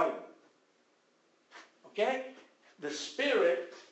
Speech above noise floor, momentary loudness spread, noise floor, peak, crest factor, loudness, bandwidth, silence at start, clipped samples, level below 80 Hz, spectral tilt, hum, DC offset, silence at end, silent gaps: 38 dB; 26 LU; -71 dBFS; -16 dBFS; 20 dB; -33 LUFS; 8.4 kHz; 0 s; under 0.1%; -86 dBFS; -2.5 dB/octave; none; under 0.1%; 0.1 s; none